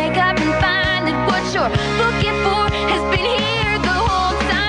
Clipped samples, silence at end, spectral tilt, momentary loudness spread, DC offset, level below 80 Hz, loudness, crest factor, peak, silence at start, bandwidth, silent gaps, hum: under 0.1%; 0 s; -5 dB/octave; 2 LU; under 0.1%; -30 dBFS; -17 LUFS; 14 dB; -2 dBFS; 0 s; 10.5 kHz; none; none